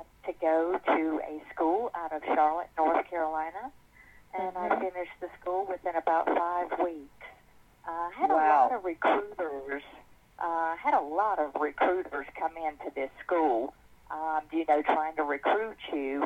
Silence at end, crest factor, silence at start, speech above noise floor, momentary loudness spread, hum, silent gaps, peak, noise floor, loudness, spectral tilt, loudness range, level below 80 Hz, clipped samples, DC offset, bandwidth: 0 s; 18 dB; 0 s; 30 dB; 12 LU; none; none; -12 dBFS; -59 dBFS; -30 LUFS; -5.5 dB/octave; 4 LU; -64 dBFS; under 0.1%; under 0.1%; 8.4 kHz